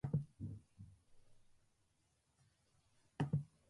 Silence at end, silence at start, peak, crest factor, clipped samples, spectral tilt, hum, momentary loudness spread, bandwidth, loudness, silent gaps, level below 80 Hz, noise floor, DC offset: 0.25 s; 0.05 s; -28 dBFS; 20 dB; under 0.1%; -8.5 dB/octave; none; 21 LU; 11 kHz; -44 LUFS; none; -68 dBFS; -80 dBFS; under 0.1%